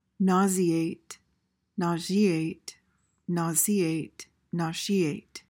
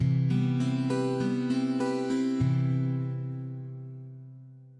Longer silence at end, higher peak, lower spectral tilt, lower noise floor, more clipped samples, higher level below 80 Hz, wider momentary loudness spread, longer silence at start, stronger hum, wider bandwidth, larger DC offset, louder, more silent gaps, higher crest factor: about the same, 0.1 s vs 0 s; first, -12 dBFS vs -16 dBFS; second, -5 dB/octave vs -8 dB/octave; first, -75 dBFS vs -49 dBFS; neither; second, -70 dBFS vs -62 dBFS; first, 20 LU vs 16 LU; first, 0.2 s vs 0 s; neither; first, 17 kHz vs 10.5 kHz; neither; about the same, -27 LUFS vs -29 LUFS; neither; first, 18 dB vs 12 dB